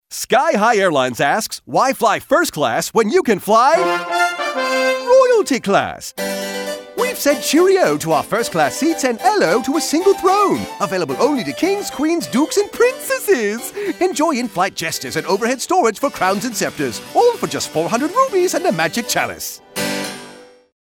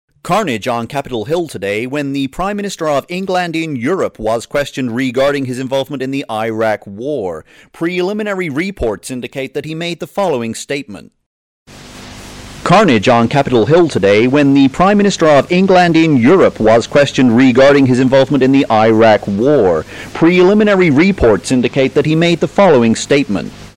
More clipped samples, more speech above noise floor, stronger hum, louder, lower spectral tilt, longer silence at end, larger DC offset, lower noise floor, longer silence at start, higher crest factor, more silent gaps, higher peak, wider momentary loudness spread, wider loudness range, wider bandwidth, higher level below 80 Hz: neither; about the same, 24 dB vs 21 dB; neither; second, -17 LUFS vs -12 LUFS; second, -3.5 dB/octave vs -6 dB/octave; first, 0.4 s vs 0.05 s; neither; first, -40 dBFS vs -33 dBFS; second, 0.1 s vs 0.25 s; about the same, 14 dB vs 12 dB; second, none vs 11.26-11.66 s; about the same, -2 dBFS vs 0 dBFS; second, 8 LU vs 12 LU; second, 3 LU vs 10 LU; first, 19 kHz vs 15 kHz; second, -56 dBFS vs -38 dBFS